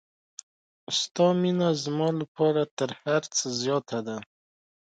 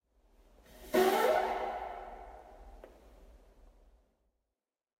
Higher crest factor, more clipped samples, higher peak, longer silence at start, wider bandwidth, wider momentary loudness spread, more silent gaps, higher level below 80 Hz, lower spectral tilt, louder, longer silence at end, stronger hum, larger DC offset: about the same, 18 dB vs 22 dB; neither; first, -10 dBFS vs -16 dBFS; first, 0.9 s vs 0.75 s; second, 9.2 kHz vs 16 kHz; second, 16 LU vs 27 LU; first, 1.11-1.15 s, 2.28-2.35 s, 2.71-2.77 s vs none; second, -74 dBFS vs -60 dBFS; about the same, -4.5 dB/octave vs -3.5 dB/octave; first, -27 LUFS vs -31 LUFS; second, 0.7 s vs 1.75 s; neither; neither